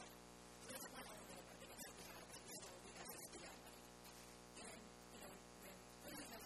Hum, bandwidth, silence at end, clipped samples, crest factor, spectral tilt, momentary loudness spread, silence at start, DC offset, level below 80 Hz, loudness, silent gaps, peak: 60 Hz at -70 dBFS; 14.5 kHz; 0 s; under 0.1%; 18 dB; -2.5 dB/octave; 6 LU; 0 s; under 0.1%; -74 dBFS; -57 LUFS; none; -40 dBFS